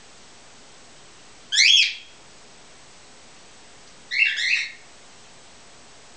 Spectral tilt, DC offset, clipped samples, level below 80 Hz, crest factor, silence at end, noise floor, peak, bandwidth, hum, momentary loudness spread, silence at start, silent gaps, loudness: 3 dB/octave; 0.3%; under 0.1%; -68 dBFS; 22 dB; 1.4 s; -48 dBFS; -4 dBFS; 8 kHz; none; 16 LU; 1.5 s; none; -18 LUFS